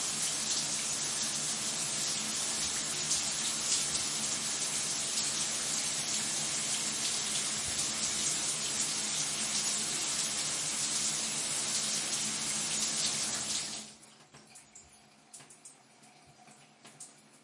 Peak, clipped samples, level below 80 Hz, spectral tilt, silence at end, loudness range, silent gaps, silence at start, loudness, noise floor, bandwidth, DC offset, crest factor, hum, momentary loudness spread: -16 dBFS; under 0.1%; -68 dBFS; 0 dB/octave; 0.05 s; 4 LU; none; 0 s; -31 LUFS; -60 dBFS; 11.5 kHz; under 0.1%; 20 dB; none; 2 LU